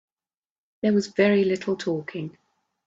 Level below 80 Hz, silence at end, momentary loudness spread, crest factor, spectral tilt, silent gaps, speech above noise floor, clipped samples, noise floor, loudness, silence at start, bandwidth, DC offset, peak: -68 dBFS; 0.55 s; 15 LU; 18 dB; -6.5 dB/octave; none; over 67 dB; under 0.1%; under -90 dBFS; -23 LUFS; 0.85 s; 7.8 kHz; under 0.1%; -8 dBFS